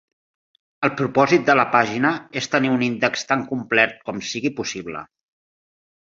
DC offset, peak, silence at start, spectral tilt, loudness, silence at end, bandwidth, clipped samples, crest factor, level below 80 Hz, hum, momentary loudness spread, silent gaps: under 0.1%; 0 dBFS; 0.8 s; -4.5 dB/octave; -20 LUFS; 1 s; 7.8 kHz; under 0.1%; 20 dB; -62 dBFS; none; 12 LU; none